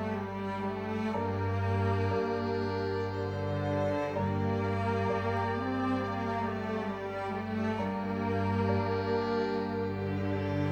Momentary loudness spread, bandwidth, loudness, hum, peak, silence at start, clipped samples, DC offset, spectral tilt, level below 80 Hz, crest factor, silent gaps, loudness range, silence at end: 5 LU; 8 kHz; -32 LUFS; 50 Hz at -60 dBFS; -16 dBFS; 0 s; under 0.1%; under 0.1%; -8 dB/octave; -60 dBFS; 16 dB; none; 1 LU; 0 s